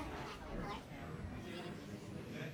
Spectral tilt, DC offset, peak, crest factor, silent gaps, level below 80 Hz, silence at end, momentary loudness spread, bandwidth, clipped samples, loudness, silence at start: -6 dB/octave; under 0.1%; -32 dBFS; 14 dB; none; -56 dBFS; 0 s; 3 LU; over 20 kHz; under 0.1%; -48 LUFS; 0 s